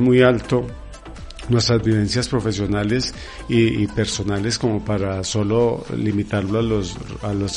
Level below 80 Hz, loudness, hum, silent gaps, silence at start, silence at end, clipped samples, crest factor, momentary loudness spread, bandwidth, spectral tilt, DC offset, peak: -38 dBFS; -20 LUFS; none; none; 0 s; 0 s; under 0.1%; 18 dB; 12 LU; 10.5 kHz; -5.5 dB/octave; under 0.1%; -2 dBFS